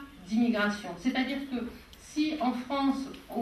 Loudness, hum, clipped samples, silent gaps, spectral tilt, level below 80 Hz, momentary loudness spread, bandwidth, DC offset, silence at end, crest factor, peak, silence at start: -31 LUFS; none; under 0.1%; none; -5 dB/octave; -58 dBFS; 10 LU; 13.5 kHz; under 0.1%; 0 s; 16 dB; -16 dBFS; 0 s